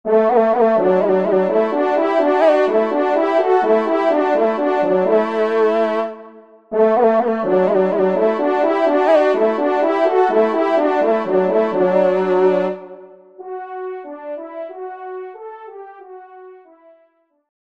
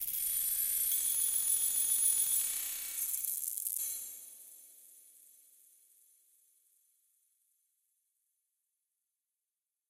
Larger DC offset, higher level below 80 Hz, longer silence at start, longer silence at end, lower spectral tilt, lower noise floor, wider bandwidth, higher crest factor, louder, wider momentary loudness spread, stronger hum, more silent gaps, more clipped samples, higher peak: neither; first, -66 dBFS vs -74 dBFS; about the same, 0.05 s vs 0 s; second, 1.15 s vs 4.9 s; first, -7.5 dB/octave vs 3.5 dB/octave; second, -59 dBFS vs under -90 dBFS; second, 7.6 kHz vs 16.5 kHz; second, 14 dB vs 22 dB; first, -16 LUFS vs -30 LUFS; about the same, 17 LU vs 16 LU; neither; neither; neither; first, -2 dBFS vs -16 dBFS